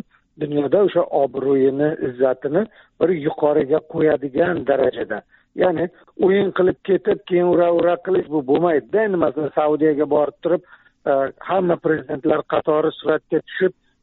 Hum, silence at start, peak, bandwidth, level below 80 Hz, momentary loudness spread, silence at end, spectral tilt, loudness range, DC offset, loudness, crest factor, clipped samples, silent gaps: none; 0.4 s; -4 dBFS; 4.2 kHz; -58 dBFS; 6 LU; 0.3 s; -5.5 dB/octave; 2 LU; under 0.1%; -19 LUFS; 16 dB; under 0.1%; none